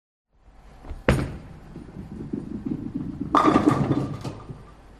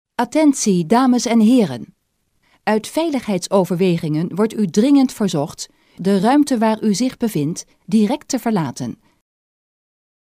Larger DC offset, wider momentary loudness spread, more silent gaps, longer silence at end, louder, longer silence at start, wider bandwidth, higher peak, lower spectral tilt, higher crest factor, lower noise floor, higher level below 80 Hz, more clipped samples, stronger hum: neither; first, 23 LU vs 11 LU; neither; second, 0 s vs 1.3 s; second, -25 LUFS vs -17 LUFS; first, 0.65 s vs 0.2 s; second, 12.5 kHz vs 16 kHz; about the same, -4 dBFS vs -2 dBFS; first, -7 dB/octave vs -5.5 dB/octave; first, 24 dB vs 16 dB; second, -51 dBFS vs -66 dBFS; first, -40 dBFS vs -58 dBFS; neither; neither